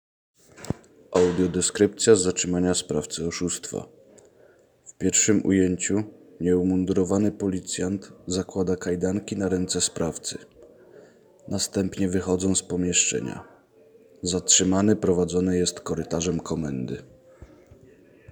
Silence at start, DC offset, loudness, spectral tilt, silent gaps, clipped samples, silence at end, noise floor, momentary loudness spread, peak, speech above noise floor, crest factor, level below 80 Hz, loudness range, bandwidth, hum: 0.6 s; under 0.1%; -24 LUFS; -4 dB/octave; none; under 0.1%; 0.85 s; -57 dBFS; 14 LU; -4 dBFS; 33 dB; 22 dB; -54 dBFS; 5 LU; over 20 kHz; none